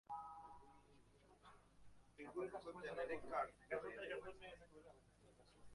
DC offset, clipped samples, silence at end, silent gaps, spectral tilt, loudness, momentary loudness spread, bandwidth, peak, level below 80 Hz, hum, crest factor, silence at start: under 0.1%; under 0.1%; 0 s; none; -5 dB/octave; -50 LUFS; 21 LU; 11.5 kHz; -30 dBFS; -74 dBFS; none; 22 dB; 0.1 s